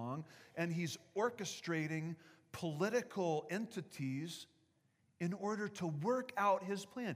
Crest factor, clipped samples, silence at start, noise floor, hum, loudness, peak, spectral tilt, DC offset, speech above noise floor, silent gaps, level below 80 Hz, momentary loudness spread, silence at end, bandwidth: 18 dB; under 0.1%; 0 s; -77 dBFS; none; -40 LUFS; -22 dBFS; -5.5 dB/octave; under 0.1%; 37 dB; none; -84 dBFS; 12 LU; 0 s; 15.5 kHz